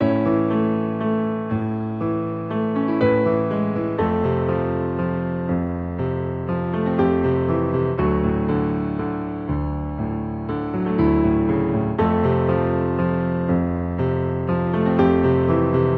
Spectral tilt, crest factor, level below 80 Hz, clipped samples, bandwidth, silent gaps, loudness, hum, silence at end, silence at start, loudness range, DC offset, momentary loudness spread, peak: -11 dB/octave; 16 dB; -38 dBFS; under 0.1%; 4.8 kHz; none; -21 LUFS; none; 0 s; 0 s; 3 LU; under 0.1%; 7 LU; -4 dBFS